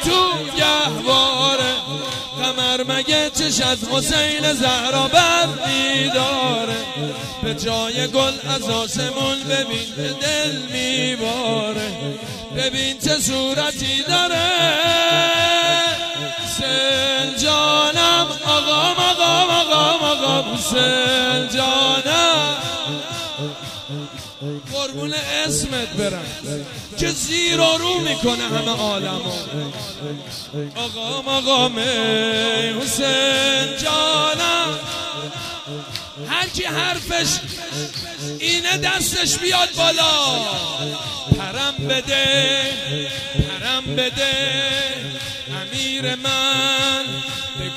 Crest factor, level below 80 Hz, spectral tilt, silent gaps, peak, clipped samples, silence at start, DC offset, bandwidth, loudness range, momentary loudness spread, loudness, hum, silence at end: 18 dB; -46 dBFS; -2.5 dB/octave; none; -2 dBFS; under 0.1%; 0 s; under 0.1%; 15.5 kHz; 6 LU; 12 LU; -18 LUFS; none; 0 s